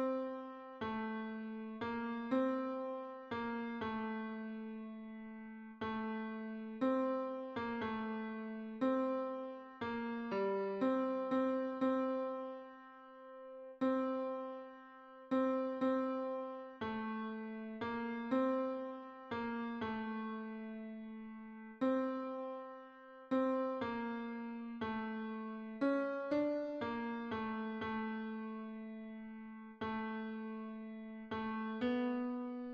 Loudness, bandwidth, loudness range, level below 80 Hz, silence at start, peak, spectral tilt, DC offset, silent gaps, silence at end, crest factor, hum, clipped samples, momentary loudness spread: -40 LUFS; 6.2 kHz; 5 LU; -74 dBFS; 0 s; -24 dBFS; -4.5 dB/octave; under 0.1%; none; 0 s; 16 dB; none; under 0.1%; 14 LU